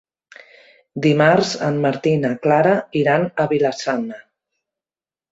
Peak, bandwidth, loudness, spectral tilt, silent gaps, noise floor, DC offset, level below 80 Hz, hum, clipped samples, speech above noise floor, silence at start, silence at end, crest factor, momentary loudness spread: -2 dBFS; 8 kHz; -18 LUFS; -6 dB/octave; none; under -90 dBFS; under 0.1%; -60 dBFS; none; under 0.1%; over 73 dB; 0.95 s; 1.1 s; 18 dB; 8 LU